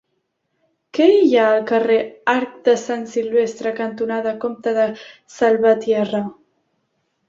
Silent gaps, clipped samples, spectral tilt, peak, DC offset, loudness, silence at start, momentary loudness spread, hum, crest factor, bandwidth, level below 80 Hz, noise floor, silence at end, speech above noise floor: none; under 0.1%; -5 dB/octave; -2 dBFS; under 0.1%; -18 LUFS; 0.95 s; 10 LU; none; 16 dB; 7.6 kHz; -66 dBFS; -72 dBFS; 0.95 s; 54 dB